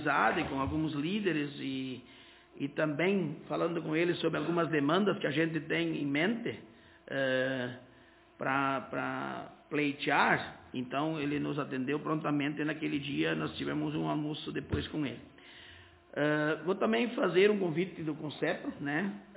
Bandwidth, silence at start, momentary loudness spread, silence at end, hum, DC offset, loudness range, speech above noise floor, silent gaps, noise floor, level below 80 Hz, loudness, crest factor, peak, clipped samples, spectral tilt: 4 kHz; 0 s; 11 LU; 0 s; none; under 0.1%; 4 LU; 28 dB; none; -60 dBFS; -60 dBFS; -32 LUFS; 20 dB; -12 dBFS; under 0.1%; -4.5 dB/octave